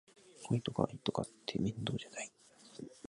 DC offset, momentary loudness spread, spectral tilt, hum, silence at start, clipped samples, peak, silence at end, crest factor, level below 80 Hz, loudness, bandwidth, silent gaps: under 0.1%; 16 LU; -5.5 dB/octave; none; 0.25 s; under 0.1%; -14 dBFS; 0.1 s; 26 dB; -66 dBFS; -39 LUFS; 11.5 kHz; none